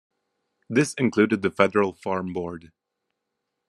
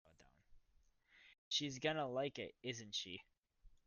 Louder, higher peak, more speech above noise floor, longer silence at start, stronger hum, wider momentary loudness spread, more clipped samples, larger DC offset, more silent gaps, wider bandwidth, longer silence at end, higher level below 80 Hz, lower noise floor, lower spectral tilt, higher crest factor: first, -23 LUFS vs -43 LUFS; first, -2 dBFS vs -24 dBFS; first, 58 dB vs 30 dB; first, 0.7 s vs 0.2 s; neither; first, 11 LU vs 8 LU; neither; neither; second, none vs 1.38-1.51 s, 3.39-3.43 s; first, 12.5 kHz vs 10 kHz; first, 1.05 s vs 0.15 s; first, -68 dBFS vs -74 dBFS; first, -81 dBFS vs -75 dBFS; first, -6 dB/octave vs -3.5 dB/octave; about the same, 24 dB vs 24 dB